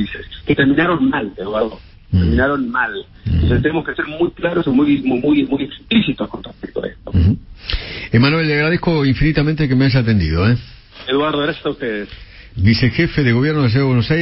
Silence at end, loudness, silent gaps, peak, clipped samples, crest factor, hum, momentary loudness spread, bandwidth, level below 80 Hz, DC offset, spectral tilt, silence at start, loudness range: 0 s; -17 LUFS; none; -2 dBFS; under 0.1%; 14 dB; none; 11 LU; 5.8 kHz; -30 dBFS; under 0.1%; -11 dB/octave; 0 s; 3 LU